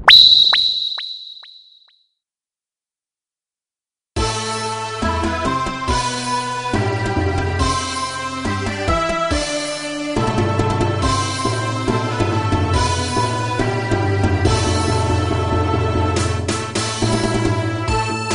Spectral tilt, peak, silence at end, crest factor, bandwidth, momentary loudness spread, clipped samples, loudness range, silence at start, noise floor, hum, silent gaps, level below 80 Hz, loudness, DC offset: -4 dB/octave; 0 dBFS; 0 s; 18 dB; 11 kHz; 6 LU; under 0.1%; 7 LU; 0 s; under -90 dBFS; none; none; -32 dBFS; -17 LUFS; under 0.1%